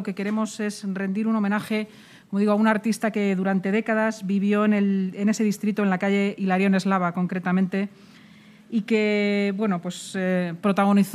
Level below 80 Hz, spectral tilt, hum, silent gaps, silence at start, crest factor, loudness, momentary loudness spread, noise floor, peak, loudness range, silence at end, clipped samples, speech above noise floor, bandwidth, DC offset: -74 dBFS; -6.5 dB/octave; none; none; 0 s; 18 dB; -23 LUFS; 8 LU; -50 dBFS; -6 dBFS; 3 LU; 0 s; under 0.1%; 27 dB; 13.5 kHz; under 0.1%